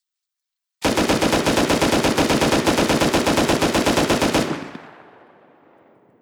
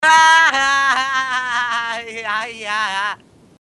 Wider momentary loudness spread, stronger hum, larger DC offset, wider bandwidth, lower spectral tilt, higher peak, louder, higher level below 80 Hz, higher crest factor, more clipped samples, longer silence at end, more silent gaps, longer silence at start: second, 5 LU vs 14 LU; neither; neither; first, over 20 kHz vs 12 kHz; first, -4 dB/octave vs 0.5 dB/octave; second, -4 dBFS vs 0 dBFS; about the same, -18 LUFS vs -16 LUFS; first, -40 dBFS vs -58 dBFS; about the same, 16 dB vs 16 dB; neither; first, 1.3 s vs 0.5 s; neither; first, 0.8 s vs 0 s